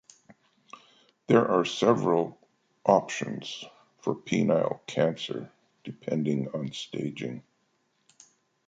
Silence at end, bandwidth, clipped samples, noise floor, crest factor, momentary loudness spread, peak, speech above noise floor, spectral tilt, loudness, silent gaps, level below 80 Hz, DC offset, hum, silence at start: 1.25 s; 9.2 kHz; under 0.1%; -72 dBFS; 24 dB; 16 LU; -6 dBFS; 45 dB; -6 dB/octave; -28 LUFS; none; -72 dBFS; under 0.1%; none; 0.75 s